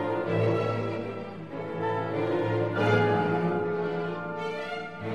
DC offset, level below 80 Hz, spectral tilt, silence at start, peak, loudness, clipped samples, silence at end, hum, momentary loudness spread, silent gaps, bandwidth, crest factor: 0.2%; -64 dBFS; -8 dB/octave; 0 s; -12 dBFS; -29 LUFS; under 0.1%; 0 s; none; 11 LU; none; 8.8 kHz; 16 dB